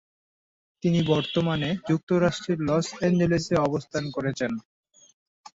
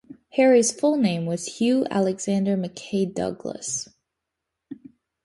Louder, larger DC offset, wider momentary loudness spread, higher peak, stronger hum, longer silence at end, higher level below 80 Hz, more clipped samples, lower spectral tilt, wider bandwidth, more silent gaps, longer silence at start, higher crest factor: about the same, -25 LUFS vs -23 LUFS; neither; second, 7 LU vs 21 LU; second, -10 dBFS vs -6 dBFS; neither; first, 0.95 s vs 0.5 s; first, -54 dBFS vs -64 dBFS; neither; first, -6.5 dB/octave vs -5 dB/octave; second, 8 kHz vs 11.5 kHz; first, 2.03-2.07 s vs none; first, 0.85 s vs 0.1 s; about the same, 16 dB vs 18 dB